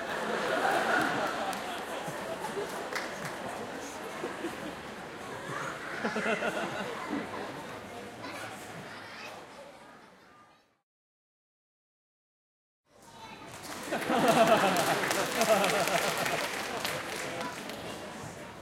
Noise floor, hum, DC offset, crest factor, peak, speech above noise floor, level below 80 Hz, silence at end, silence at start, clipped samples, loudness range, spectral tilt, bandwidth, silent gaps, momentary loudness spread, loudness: -61 dBFS; none; under 0.1%; 22 dB; -12 dBFS; 27 dB; -66 dBFS; 0 s; 0 s; under 0.1%; 18 LU; -3 dB/octave; 17 kHz; 10.83-12.84 s; 17 LU; -32 LUFS